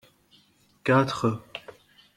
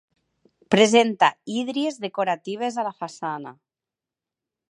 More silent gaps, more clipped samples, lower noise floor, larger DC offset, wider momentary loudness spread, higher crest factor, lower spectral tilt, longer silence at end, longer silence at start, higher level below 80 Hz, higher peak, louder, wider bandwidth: neither; neither; second, -62 dBFS vs -89 dBFS; neither; first, 19 LU vs 14 LU; about the same, 22 dB vs 22 dB; first, -6.5 dB/octave vs -4 dB/octave; second, 0.6 s vs 1.2 s; first, 0.85 s vs 0.7 s; first, -62 dBFS vs -76 dBFS; second, -6 dBFS vs -2 dBFS; second, -25 LUFS vs -22 LUFS; first, 14 kHz vs 11.5 kHz